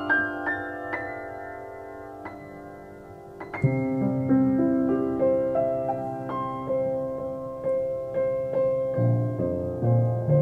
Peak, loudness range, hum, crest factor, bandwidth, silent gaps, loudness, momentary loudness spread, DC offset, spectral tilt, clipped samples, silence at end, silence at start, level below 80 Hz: -12 dBFS; 8 LU; none; 14 dB; 4.6 kHz; none; -26 LUFS; 16 LU; under 0.1%; -10 dB/octave; under 0.1%; 0 s; 0 s; -54 dBFS